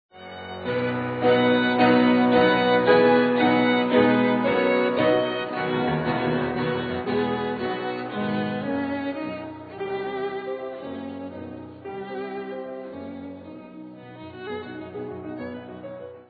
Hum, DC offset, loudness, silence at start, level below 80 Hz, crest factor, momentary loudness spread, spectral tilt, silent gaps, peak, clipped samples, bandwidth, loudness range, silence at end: none; under 0.1%; -23 LUFS; 0.15 s; -60 dBFS; 20 dB; 20 LU; -9 dB/octave; none; -4 dBFS; under 0.1%; 4.9 kHz; 17 LU; 0.05 s